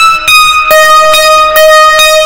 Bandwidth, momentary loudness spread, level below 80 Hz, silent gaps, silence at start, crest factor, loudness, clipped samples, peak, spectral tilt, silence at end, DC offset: over 20 kHz; 2 LU; -32 dBFS; none; 0 s; 4 dB; -2 LUFS; 10%; 0 dBFS; 1 dB/octave; 0 s; under 0.1%